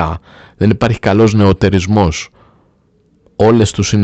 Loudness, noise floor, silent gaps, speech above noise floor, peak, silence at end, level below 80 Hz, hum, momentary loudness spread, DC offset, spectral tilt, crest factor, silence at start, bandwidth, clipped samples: -12 LUFS; -54 dBFS; none; 42 dB; 0 dBFS; 0 s; -34 dBFS; none; 14 LU; under 0.1%; -6.5 dB/octave; 12 dB; 0 s; 8.8 kHz; under 0.1%